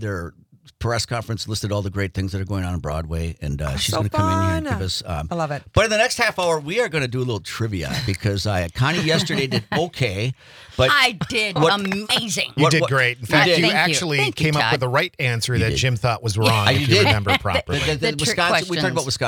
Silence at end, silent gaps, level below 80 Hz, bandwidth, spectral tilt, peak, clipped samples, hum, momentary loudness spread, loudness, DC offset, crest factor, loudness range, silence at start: 0 s; none; -42 dBFS; 19.5 kHz; -4.5 dB/octave; -2 dBFS; under 0.1%; none; 10 LU; -20 LUFS; under 0.1%; 18 dB; 6 LU; 0 s